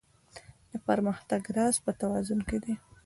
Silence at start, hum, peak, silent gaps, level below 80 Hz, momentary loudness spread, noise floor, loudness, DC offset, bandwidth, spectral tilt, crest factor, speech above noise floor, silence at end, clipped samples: 0.35 s; none; -12 dBFS; none; -54 dBFS; 19 LU; -53 dBFS; -31 LUFS; under 0.1%; 11.5 kHz; -5 dB/octave; 20 dB; 23 dB; 0.3 s; under 0.1%